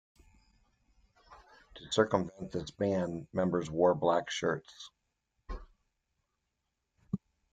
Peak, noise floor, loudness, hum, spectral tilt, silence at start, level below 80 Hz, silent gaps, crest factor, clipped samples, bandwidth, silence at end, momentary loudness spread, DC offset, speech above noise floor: -12 dBFS; -84 dBFS; -33 LUFS; none; -5.5 dB/octave; 1.3 s; -56 dBFS; none; 24 dB; under 0.1%; 9.4 kHz; 0.35 s; 20 LU; under 0.1%; 52 dB